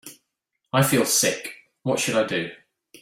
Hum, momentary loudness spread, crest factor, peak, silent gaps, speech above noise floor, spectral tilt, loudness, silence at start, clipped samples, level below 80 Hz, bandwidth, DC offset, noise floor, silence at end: none; 14 LU; 20 dB; -4 dBFS; none; 57 dB; -3.5 dB/octave; -22 LUFS; 0.05 s; under 0.1%; -64 dBFS; 16.5 kHz; under 0.1%; -79 dBFS; 0.45 s